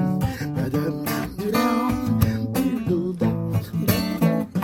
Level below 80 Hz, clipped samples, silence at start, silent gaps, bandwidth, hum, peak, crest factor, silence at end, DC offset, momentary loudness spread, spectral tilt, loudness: -42 dBFS; under 0.1%; 0 s; none; 17 kHz; none; -4 dBFS; 18 dB; 0 s; under 0.1%; 5 LU; -6.5 dB/octave; -23 LUFS